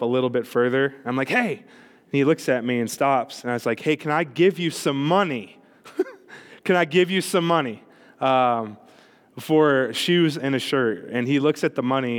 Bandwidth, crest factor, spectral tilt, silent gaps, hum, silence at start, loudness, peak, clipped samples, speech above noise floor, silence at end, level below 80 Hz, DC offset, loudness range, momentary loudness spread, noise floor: 19 kHz; 16 dB; -5.5 dB/octave; none; none; 0 s; -22 LUFS; -6 dBFS; under 0.1%; 31 dB; 0 s; -80 dBFS; under 0.1%; 2 LU; 10 LU; -53 dBFS